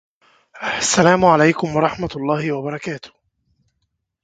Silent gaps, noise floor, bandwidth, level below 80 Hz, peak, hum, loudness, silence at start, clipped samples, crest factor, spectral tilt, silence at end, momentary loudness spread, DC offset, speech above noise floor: none; -73 dBFS; 9.6 kHz; -50 dBFS; 0 dBFS; none; -17 LUFS; 0.55 s; under 0.1%; 20 dB; -4.5 dB/octave; 1.15 s; 15 LU; under 0.1%; 55 dB